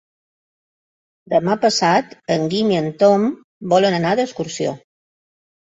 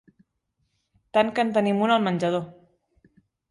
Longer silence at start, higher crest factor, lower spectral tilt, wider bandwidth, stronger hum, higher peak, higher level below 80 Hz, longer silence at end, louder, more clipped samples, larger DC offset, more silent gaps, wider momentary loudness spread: first, 1.3 s vs 1.15 s; about the same, 18 dB vs 18 dB; second, -5 dB/octave vs -6.5 dB/octave; second, 8 kHz vs 11.5 kHz; neither; first, -2 dBFS vs -8 dBFS; first, -60 dBFS vs -68 dBFS; about the same, 1 s vs 1 s; first, -18 LUFS vs -23 LUFS; neither; neither; first, 3.44-3.61 s vs none; about the same, 9 LU vs 7 LU